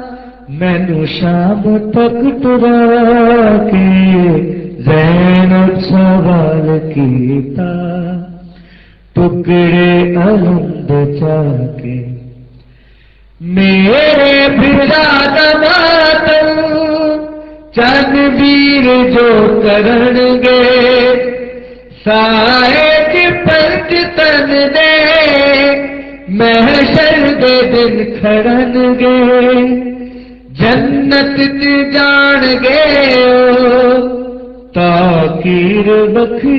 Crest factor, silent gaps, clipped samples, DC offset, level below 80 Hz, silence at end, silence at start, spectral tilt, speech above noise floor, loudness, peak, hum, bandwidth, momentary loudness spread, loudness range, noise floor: 8 dB; none; under 0.1%; under 0.1%; -34 dBFS; 0 s; 0 s; -8 dB/octave; 34 dB; -8 LUFS; 0 dBFS; none; 6 kHz; 11 LU; 5 LU; -42 dBFS